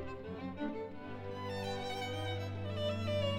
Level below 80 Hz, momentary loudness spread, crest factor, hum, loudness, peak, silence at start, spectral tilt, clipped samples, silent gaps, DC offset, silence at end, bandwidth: -62 dBFS; 8 LU; 16 dB; none; -40 LUFS; -24 dBFS; 0 s; -6 dB/octave; under 0.1%; none; under 0.1%; 0 s; 14 kHz